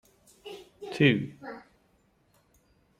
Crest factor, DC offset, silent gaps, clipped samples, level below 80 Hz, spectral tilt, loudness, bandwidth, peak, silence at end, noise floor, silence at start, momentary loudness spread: 22 dB; under 0.1%; none; under 0.1%; -66 dBFS; -7 dB/octave; -26 LUFS; 13 kHz; -10 dBFS; 1.4 s; -67 dBFS; 0.45 s; 23 LU